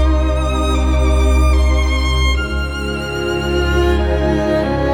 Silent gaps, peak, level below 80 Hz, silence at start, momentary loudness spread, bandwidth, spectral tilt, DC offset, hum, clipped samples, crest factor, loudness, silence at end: none; -2 dBFS; -16 dBFS; 0 s; 6 LU; 11.5 kHz; -6 dB/octave; under 0.1%; none; under 0.1%; 12 dB; -16 LUFS; 0 s